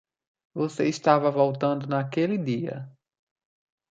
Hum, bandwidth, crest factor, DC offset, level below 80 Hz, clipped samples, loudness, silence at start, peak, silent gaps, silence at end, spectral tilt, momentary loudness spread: none; 9 kHz; 22 dB; under 0.1%; -72 dBFS; under 0.1%; -25 LUFS; 0.55 s; -4 dBFS; none; 1 s; -7 dB/octave; 15 LU